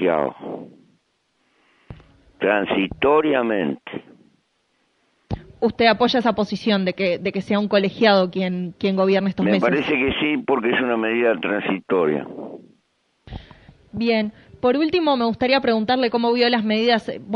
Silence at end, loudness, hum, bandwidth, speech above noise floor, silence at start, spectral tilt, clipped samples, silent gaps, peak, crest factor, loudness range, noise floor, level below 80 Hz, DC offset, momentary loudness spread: 0 s; -20 LUFS; none; 7 kHz; 48 dB; 0 s; -7 dB/octave; under 0.1%; none; 0 dBFS; 20 dB; 5 LU; -68 dBFS; -50 dBFS; under 0.1%; 16 LU